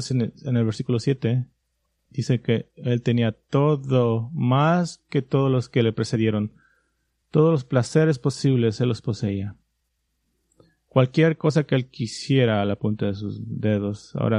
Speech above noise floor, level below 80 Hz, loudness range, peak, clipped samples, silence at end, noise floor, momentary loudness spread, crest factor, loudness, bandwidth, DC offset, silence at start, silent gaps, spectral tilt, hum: 52 dB; -60 dBFS; 3 LU; -4 dBFS; under 0.1%; 0 s; -74 dBFS; 8 LU; 20 dB; -23 LUFS; 10.5 kHz; under 0.1%; 0 s; none; -7 dB/octave; none